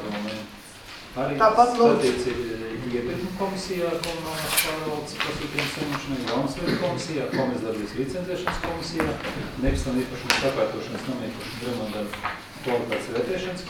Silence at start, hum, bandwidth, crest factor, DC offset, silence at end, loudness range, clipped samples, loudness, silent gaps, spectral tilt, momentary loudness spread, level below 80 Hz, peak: 0 s; none; 19.5 kHz; 26 dB; under 0.1%; 0 s; 4 LU; under 0.1%; -26 LUFS; none; -4.5 dB/octave; 11 LU; -42 dBFS; 0 dBFS